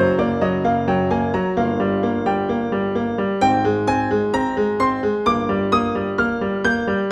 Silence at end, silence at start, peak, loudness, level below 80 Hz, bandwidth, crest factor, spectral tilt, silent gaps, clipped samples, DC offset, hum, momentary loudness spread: 0 s; 0 s; -4 dBFS; -20 LUFS; -44 dBFS; 10.5 kHz; 16 dB; -7 dB/octave; none; under 0.1%; under 0.1%; none; 3 LU